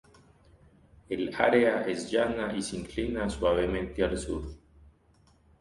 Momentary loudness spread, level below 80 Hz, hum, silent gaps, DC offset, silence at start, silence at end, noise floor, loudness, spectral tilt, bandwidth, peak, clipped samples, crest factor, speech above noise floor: 11 LU; -46 dBFS; none; none; under 0.1%; 1.1 s; 0.7 s; -63 dBFS; -29 LUFS; -5 dB/octave; 11.5 kHz; -10 dBFS; under 0.1%; 20 dB; 35 dB